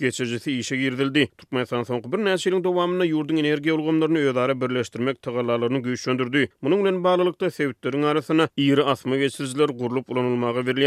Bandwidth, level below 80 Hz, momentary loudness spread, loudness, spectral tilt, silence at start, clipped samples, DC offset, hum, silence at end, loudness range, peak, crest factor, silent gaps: 14 kHz; -70 dBFS; 6 LU; -23 LUFS; -5.5 dB/octave; 0 s; under 0.1%; under 0.1%; none; 0 s; 1 LU; -6 dBFS; 16 dB; none